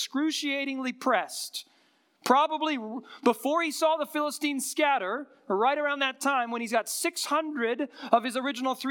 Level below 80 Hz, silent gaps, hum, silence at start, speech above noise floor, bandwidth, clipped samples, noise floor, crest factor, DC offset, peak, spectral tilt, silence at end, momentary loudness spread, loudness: -88 dBFS; none; none; 0 s; 38 dB; 18 kHz; under 0.1%; -66 dBFS; 22 dB; under 0.1%; -6 dBFS; -2 dB/octave; 0 s; 8 LU; -28 LUFS